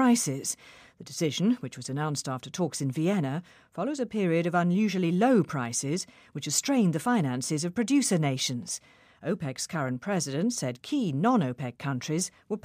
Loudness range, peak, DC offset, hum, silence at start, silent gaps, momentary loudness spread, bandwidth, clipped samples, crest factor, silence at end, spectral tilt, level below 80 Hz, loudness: 4 LU; -12 dBFS; under 0.1%; none; 0 s; none; 10 LU; 15.5 kHz; under 0.1%; 16 dB; 0.05 s; -5 dB/octave; -72 dBFS; -28 LUFS